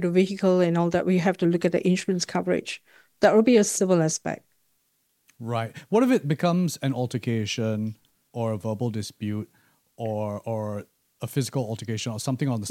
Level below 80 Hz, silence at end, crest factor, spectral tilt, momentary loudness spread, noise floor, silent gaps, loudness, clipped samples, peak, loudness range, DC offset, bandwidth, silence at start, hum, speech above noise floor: -66 dBFS; 0 s; 18 dB; -5.5 dB/octave; 13 LU; -71 dBFS; none; -25 LUFS; under 0.1%; -6 dBFS; 8 LU; under 0.1%; 16 kHz; 0 s; none; 47 dB